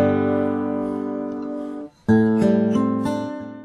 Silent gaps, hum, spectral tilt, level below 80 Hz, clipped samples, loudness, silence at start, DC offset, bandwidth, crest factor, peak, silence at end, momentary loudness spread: none; none; -8.5 dB/octave; -54 dBFS; under 0.1%; -21 LUFS; 0 s; under 0.1%; 11 kHz; 16 dB; -4 dBFS; 0 s; 12 LU